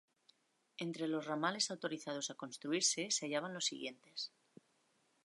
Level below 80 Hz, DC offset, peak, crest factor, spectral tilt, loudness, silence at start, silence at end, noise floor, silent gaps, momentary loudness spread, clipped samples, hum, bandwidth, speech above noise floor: under -90 dBFS; under 0.1%; -20 dBFS; 20 dB; -2 dB/octave; -39 LUFS; 0.8 s; 0.95 s; -77 dBFS; none; 12 LU; under 0.1%; none; 11.5 kHz; 37 dB